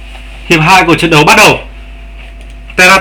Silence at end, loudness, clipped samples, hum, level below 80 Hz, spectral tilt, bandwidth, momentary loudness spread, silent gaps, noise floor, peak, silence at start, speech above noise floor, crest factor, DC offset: 0 s; -5 LUFS; 4%; none; -28 dBFS; -3.5 dB/octave; over 20 kHz; 10 LU; none; -27 dBFS; 0 dBFS; 0 s; 21 dB; 8 dB; under 0.1%